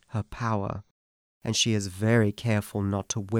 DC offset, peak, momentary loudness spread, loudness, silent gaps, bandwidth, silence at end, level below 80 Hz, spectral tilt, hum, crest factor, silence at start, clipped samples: under 0.1%; -10 dBFS; 11 LU; -27 LUFS; 0.91-1.41 s; 16 kHz; 0 s; -54 dBFS; -4.5 dB/octave; none; 18 dB; 0.1 s; under 0.1%